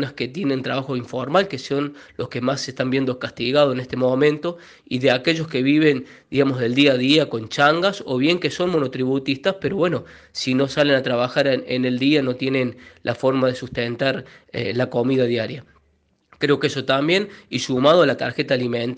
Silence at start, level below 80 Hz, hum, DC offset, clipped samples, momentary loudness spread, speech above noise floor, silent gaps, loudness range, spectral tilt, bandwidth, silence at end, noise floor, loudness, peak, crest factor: 0 s; -58 dBFS; none; under 0.1%; under 0.1%; 10 LU; 43 dB; none; 4 LU; -5.5 dB/octave; 9.4 kHz; 0 s; -64 dBFS; -20 LUFS; -2 dBFS; 18 dB